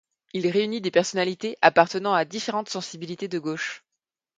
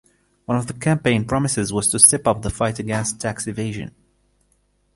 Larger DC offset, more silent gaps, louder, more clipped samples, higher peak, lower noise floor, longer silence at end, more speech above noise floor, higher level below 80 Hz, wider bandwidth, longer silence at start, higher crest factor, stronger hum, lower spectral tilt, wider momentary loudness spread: neither; neither; second, -24 LUFS vs -19 LUFS; neither; about the same, 0 dBFS vs 0 dBFS; first, -85 dBFS vs -64 dBFS; second, 0.6 s vs 1.05 s; first, 60 dB vs 44 dB; second, -72 dBFS vs -44 dBFS; second, 9.4 kHz vs 16 kHz; second, 0.35 s vs 0.5 s; about the same, 24 dB vs 22 dB; second, none vs 50 Hz at -45 dBFS; about the same, -4 dB/octave vs -4 dB/octave; about the same, 14 LU vs 16 LU